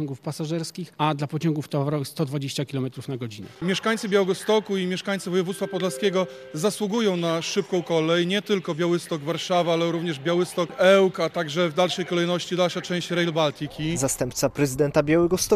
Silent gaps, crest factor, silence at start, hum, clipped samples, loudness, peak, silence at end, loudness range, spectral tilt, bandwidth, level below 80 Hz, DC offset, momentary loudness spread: none; 20 dB; 0 s; none; under 0.1%; -24 LUFS; -4 dBFS; 0 s; 4 LU; -5 dB/octave; 14.5 kHz; -56 dBFS; under 0.1%; 8 LU